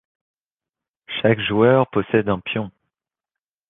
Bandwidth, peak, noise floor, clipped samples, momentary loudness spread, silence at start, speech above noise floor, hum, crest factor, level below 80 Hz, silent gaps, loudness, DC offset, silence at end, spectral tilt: 4 kHz; -2 dBFS; -89 dBFS; under 0.1%; 12 LU; 1.1 s; 71 dB; none; 20 dB; -54 dBFS; none; -19 LUFS; under 0.1%; 1 s; -10 dB/octave